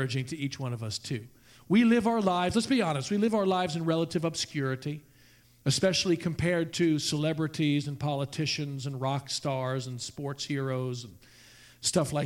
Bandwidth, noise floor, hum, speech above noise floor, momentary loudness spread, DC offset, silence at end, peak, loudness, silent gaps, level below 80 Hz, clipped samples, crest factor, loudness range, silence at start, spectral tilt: 16.5 kHz; -59 dBFS; none; 30 dB; 10 LU; under 0.1%; 0 s; -12 dBFS; -29 LUFS; none; -60 dBFS; under 0.1%; 18 dB; 5 LU; 0 s; -5 dB/octave